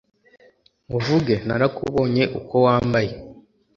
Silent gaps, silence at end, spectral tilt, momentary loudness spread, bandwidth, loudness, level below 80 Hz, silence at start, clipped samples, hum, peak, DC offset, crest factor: none; 0.45 s; -7.5 dB/octave; 10 LU; 7.4 kHz; -21 LUFS; -48 dBFS; 0.9 s; under 0.1%; none; -4 dBFS; under 0.1%; 18 dB